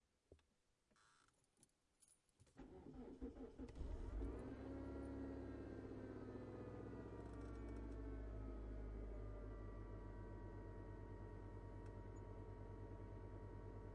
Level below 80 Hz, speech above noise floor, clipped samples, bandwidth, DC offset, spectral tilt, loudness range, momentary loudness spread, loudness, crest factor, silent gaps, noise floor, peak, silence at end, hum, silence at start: -58 dBFS; 33 dB; under 0.1%; 10.5 kHz; under 0.1%; -8.5 dB/octave; 6 LU; 5 LU; -55 LUFS; 16 dB; none; -84 dBFS; -38 dBFS; 0 s; none; 0.3 s